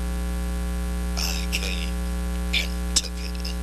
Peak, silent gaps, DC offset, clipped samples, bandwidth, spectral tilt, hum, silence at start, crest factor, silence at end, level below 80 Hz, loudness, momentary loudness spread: -6 dBFS; none; under 0.1%; under 0.1%; 13 kHz; -3.5 dB/octave; 60 Hz at -25 dBFS; 0 s; 20 dB; 0 s; -28 dBFS; -27 LUFS; 5 LU